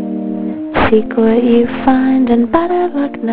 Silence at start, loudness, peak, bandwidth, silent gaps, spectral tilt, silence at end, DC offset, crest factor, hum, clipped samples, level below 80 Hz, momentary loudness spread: 0 s; -13 LUFS; 0 dBFS; 4.6 kHz; none; -12 dB/octave; 0 s; 3%; 12 dB; none; under 0.1%; -36 dBFS; 8 LU